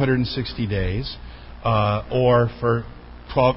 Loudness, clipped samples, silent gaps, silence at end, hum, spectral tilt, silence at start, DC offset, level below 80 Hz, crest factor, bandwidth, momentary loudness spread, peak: -22 LUFS; under 0.1%; none; 0 s; none; -11.5 dB/octave; 0 s; under 0.1%; -36 dBFS; 16 dB; 5.8 kHz; 19 LU; -6 dBFS